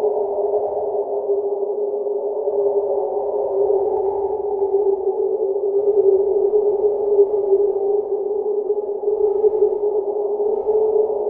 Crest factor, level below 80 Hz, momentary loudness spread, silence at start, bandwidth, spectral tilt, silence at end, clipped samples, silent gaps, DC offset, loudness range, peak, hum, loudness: 14 dB; -58 dBFS; 6 LU; 0 s; 1.4 kHz; -12 dB/octave; 0 s; under 0.1%; none; under 0.1%; 3 LU; -4 dBFS; none; -19 LUFS